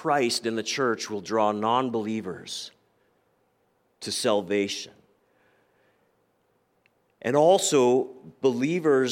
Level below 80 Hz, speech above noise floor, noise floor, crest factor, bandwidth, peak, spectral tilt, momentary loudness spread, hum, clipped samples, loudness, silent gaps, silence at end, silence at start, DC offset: -76 dBFS; 45 dB; -69 dBFS; 18 dB; 16.5 kHz; -8 dBFS; -4 dB/octave; 15 LU; none; under 0.1%; -25 LUFS; none; 0 s; 0 s; under 0.1%